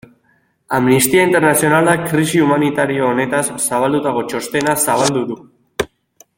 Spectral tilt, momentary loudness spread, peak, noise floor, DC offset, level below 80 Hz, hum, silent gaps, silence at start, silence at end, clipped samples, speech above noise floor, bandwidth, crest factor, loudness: -4.5 dB/octave; 13 LU; 0 dBFS; -59 dBFS; under 0.1%; -52 dBFS; none; none; 0.7 s; 0.55 s; under 0.1%; 45 dB; 17 kHz; 16 dB; -15 LUFS